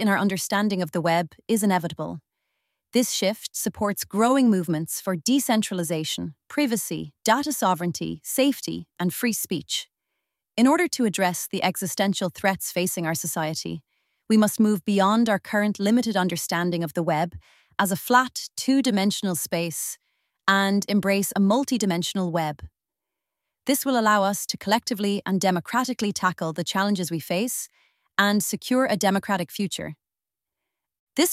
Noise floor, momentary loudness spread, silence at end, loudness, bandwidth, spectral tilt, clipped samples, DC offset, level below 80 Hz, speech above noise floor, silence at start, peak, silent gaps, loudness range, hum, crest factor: -89 dBFS; 9 LU; 0 s; -24 LUFS; 16 kHz; -4 dB/octave; under 0.1%; under 0.1%; -62 dBFS; 66 dB; 0 s; -4 dBFS; 30.99-31.07 s; 2 LU; none; 20 dB